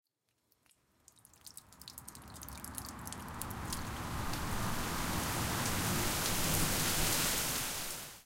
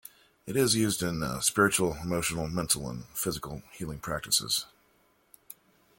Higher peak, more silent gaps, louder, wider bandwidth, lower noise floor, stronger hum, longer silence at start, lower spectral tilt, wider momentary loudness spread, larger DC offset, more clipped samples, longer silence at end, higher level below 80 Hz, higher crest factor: second, -16 dBFS vs -8 dBFS; neither; second, -35 LUFS vs -28 LUFS; about the same, 17 kHz vs 17 kHz; first, -78 dBFS vs -67 dBFS; neither; first, 1.45 s vs 0.45 s; about the same, -2.5 dB/octave vs -3 dB/octave; first, 19 LU vs 16 LU; neither; neither; second, 0.05 s vs 1.35 s; first, -48 dBFS vs -54 dBFS; about the same, 22 dB vs 22 dB